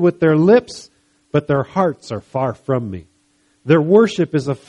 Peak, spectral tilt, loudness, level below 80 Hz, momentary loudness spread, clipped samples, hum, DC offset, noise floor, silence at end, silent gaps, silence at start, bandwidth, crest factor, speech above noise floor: 0 dBFS; -7.5 dB/octave; -16 LUFS; -54 dBFS; 19 LU; under 0.1%; none; under 0.1%; -60 dBFS; 0.1 s; none; 0 s; 11 kHz; 16 dB; 44 dB